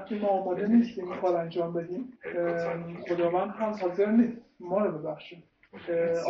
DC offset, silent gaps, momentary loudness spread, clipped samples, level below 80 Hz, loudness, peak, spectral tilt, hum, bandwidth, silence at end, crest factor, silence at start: under 0.1%; none; 13 LU; under 0.1%; -70 dBFS; -29 LUFS; -12 dBFS; -6.5 dB/octave; none; 7.2 kHz; 0 s; 16 dB; 0 s